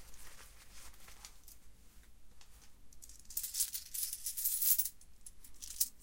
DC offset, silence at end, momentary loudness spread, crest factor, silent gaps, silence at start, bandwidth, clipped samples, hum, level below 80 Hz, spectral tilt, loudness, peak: under 0.1%; 0 s; 26 LU; 28 dB; none; 0 s; 17 kHz; under 0.1%; none; -62 dBFS; 1.5 dB/octave; -35 LUFS; -14 dBFS